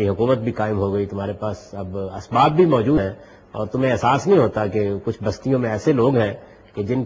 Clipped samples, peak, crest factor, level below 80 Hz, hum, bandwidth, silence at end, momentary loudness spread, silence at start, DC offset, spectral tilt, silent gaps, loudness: under 0.1%; -4 dBFS; 16 dB; -46 dBFS; none; 7.6 kHz; 0 s; 14 LU; 0 s; under 0.1%; -7.5 dB/octave; none; -20 LUFS